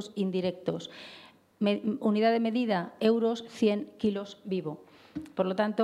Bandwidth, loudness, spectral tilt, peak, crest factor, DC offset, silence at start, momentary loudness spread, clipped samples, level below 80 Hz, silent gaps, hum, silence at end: 11.5 kHz; -30 LUFS; -7 dB/octave; -12 dBFS; 18 dB; under 0.1%; 0 s; 17 LU; under 0.1%; -72 dBFS; none; none; 0 s